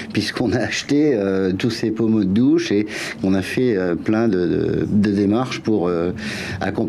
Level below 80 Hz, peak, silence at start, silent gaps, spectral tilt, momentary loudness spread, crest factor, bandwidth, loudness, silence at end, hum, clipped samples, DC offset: -50 dBFS; -8 dBFS; 0 s; none; -6 dB/octave; 6 LU; 12 dB; 13 kHz; -19 LUFS; 0 s; none; under 0.1%; under 0.1%